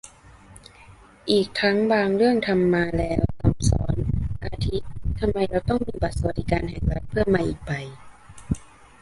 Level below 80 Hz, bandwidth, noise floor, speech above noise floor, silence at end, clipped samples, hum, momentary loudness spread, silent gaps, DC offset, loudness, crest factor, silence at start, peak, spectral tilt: -34 dBFS; 11.5 kHz; -49 dBFS; 27 dB; 0.35 s; under 0.1%; none; 11 LU; none; under 0.1%; -24 LUFS; 20 dB; 0.05 s; -4 dBFS; -6.5 dB/octave